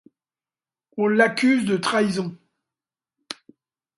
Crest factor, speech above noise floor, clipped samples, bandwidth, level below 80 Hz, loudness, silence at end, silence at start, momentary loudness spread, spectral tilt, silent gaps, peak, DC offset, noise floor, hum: 20 dB; over 70 dB; under 0.1%; 11.5 kHz; -68 dBFS; -21 LUFS; 0.65 s; 0.95 s; 20 LU; -5 dB/octave; none; -6 dBFS; under 0.1%; under -90 dBFS; none